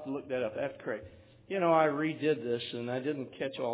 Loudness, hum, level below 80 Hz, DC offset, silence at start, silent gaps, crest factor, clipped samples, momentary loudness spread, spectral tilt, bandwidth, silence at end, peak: -33 LUFS; none; -68 dBFS; under 0.1%; 0 s; none; 18 dB; under 0.1%; 12 LU; -4.5 dB/octave; 4 kHz; 0 s; -14 dBFS